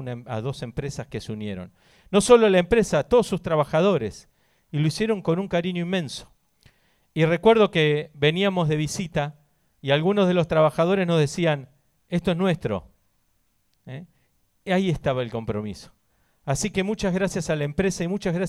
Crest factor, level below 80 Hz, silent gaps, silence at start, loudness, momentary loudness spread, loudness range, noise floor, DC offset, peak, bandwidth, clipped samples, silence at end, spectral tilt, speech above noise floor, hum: 22 dB; -48 dBFS; none; 0 s; -23 LUFS; 15 LU; 8 LU; -69 dBFS; under 0.1%; -2 dBFS; 13.5 kHz; under 0.1%; 0 s; -5.5 dB/octave; 47 dB; none